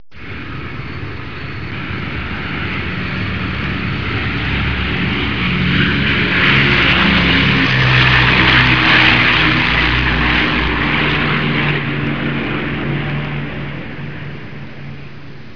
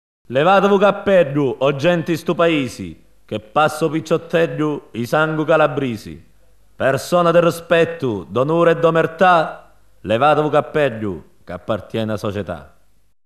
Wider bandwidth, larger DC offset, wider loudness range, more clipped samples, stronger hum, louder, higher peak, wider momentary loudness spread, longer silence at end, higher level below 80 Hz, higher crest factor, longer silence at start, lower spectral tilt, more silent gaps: second, 5.4 kHz vs 13.5 kHz; first, 3% vs 0.3%; first, 12 LU vs 3 LU; neither; neither; first, -13 LUFS vs -17 LUFS; first, 0 dBFS vs -4 dBFS; first, 18 LU vs 14 LU; second, 0 s vs 0.6 s; first, -28 dBFS vs -52 dBFS; about the same, 16 dB vs 14 dB; second, 0.15 s vs 0.3 s; about the same, -6 dB/octave vs -6 dB/octave; neither